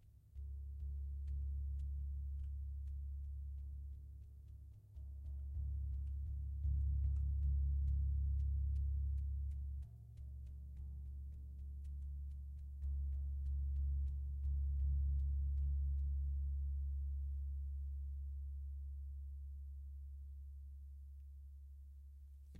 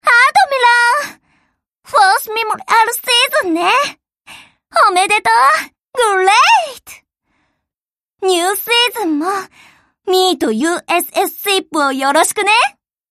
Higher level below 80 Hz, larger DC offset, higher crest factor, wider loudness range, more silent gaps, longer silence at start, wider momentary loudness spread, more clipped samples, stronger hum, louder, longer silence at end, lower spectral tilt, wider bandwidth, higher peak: first, -42 dBFS vs -64 dBFS; neither; about the same, 12 dB vs 14 dB; first, 10 LU vs 4 LU; neither; about the same, 0 s vs 0.05 s; first, 16 LU vs 9 LU; neither; neither; second, -44 LUFS vs -13 LUFS; second, 0 s vs 0.4 s; first, -10 dB/octave vs -0.5 dB/octave; second, 0.6 kHz vs 15.5 kHz; second, -30 dBFS vs 0 dBFS